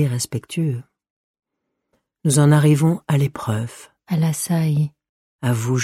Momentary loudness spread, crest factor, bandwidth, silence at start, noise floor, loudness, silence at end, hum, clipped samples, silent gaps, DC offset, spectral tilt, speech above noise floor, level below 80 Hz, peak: 12 LU; 16 dB; 15.5 kHz; 0 s; -78 dBFS; -20 LUFS; 0 s; none; under 0.1%; 1.10-1.34 s, 5.09-5.39 s; under 0.1%; -6 dB/octave; 59 dB; -58 dBFS; -4 dBFS